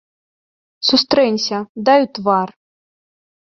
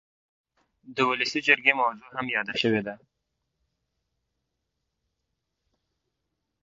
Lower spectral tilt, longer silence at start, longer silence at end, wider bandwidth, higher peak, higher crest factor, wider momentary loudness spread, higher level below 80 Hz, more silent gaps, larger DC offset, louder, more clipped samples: about the same, -4 dB/octave vs -4 dB/octave; about the same, 0.8 s vs 0.85 s; second, 0.95 s vs 3.7 s; about the same, 7.4 kHz vs 7.8 kHz; about the same, -2 dBFS vs -2 dBFS; second, 18 dB vs 28 dB; second, 7 LU vs 13 LU; first, -60 dBFS vs -74 dBFS; first, 1.69-1.75 s vs none; neither; first, -16 LUFS vs -24 LUFS; neither